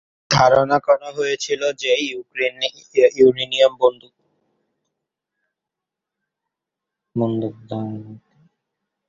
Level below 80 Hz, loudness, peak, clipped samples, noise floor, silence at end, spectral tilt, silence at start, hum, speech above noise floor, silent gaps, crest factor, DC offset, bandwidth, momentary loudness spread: -56 dBFS; -18 LUFS; -2 dBFS; under 0.1%; -85 dBFS; 0.9 s; -4.5 dB/octave; 0.3 s; none; 66 dB; none; 20 dB; under 0.1%; 7.6 kHz; 14 LU